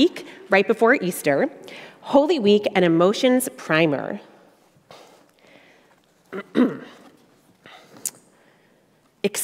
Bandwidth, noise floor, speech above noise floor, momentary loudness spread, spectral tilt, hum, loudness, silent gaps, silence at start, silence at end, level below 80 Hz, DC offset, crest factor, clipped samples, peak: 16 kHz; -60 dBFS; 40 dB; 19 LU; -4.5 dB/octave; none; -20 LUFS; none; 0 s; 0 s; -68 dBFS; under 0.1%; 20 dB; under 0.1%; -2 dBFS